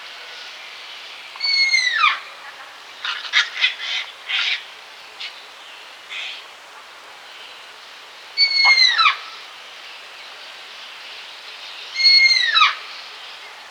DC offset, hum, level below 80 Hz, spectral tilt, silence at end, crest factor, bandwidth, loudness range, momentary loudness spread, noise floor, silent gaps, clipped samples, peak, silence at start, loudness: under 0.1%; none; -84 dBFS; 4 dB/octave; 0 s; 22 dB; 19.5 kHz; 11 LU; 26 LU; -41 dBFS; none; under 0.1%; 0 dBFS; 0 s; -16 LUFS